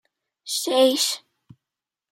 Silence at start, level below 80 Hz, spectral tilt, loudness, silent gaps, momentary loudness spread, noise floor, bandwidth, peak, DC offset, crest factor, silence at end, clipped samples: 0.45 s; -80 dBFS; -1 dB/octave; -21 LUFS; none; 14 LU; -88 dBFS; 16 kHz; -6 dBFS; under 0.1%; 20 dB; 0.95 s; under 0.1%